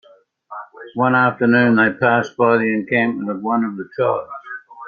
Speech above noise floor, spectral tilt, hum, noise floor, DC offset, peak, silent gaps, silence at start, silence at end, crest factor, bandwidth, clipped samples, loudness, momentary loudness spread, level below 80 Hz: 27 dB; -7.5 dB/octave; none; -44 dBFS; under 0.1%; -2 dBFS; none; 0.5 s; 0 s; 16 dB; 6.8 kHz; under 0.1%; -17 LUFS; 19 LU; -64 dBFS